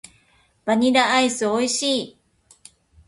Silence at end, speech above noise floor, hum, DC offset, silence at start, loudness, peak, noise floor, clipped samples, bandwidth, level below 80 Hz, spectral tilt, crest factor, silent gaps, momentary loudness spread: 1 s; 41 dB; none; under 0.1%; 0.65 s; -20 LUFS; -4 dBFS; -60 dBFS; under 0.1%; 11.5 kHz; -62 dBFS; -2.5 dB/octave; 18 dB; none; 11 LU